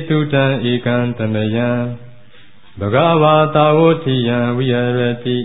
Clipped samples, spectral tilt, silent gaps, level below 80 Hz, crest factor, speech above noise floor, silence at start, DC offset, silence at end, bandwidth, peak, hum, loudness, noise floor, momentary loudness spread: under 0.1%; -12.5 dB/octave; none; -48 dBFS; 14 dB; 33 dB; 0 s; 1%; 0 s; 4 kHz; 0 dBFS; none; -15 LUFS; -47 dBFS; 7 LU